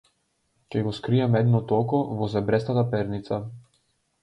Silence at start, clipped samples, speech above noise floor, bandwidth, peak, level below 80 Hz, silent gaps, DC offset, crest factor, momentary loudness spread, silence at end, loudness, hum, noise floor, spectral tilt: 0.7 s; under 0.1%; 48 dB; 8.2 kHz; -8 dBFS; -56 dBFS; none; under 0.1%; 16 dB; 10 LU; 0.65 s; -25 LUFS; none; -71 dBFS; -9 dB/octave